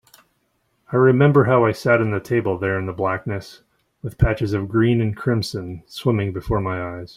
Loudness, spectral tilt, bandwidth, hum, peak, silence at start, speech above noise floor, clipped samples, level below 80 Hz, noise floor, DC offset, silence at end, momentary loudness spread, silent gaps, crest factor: -20 LUFS; -7.5 dB/octave; 15 kHz; none; -2 dBFS; 0.9 s; 48 dB; under 0.1%; -38 dBFS; -68 dBFS; under 0.1%; 0.05 s; 13 LU; none; 18 dB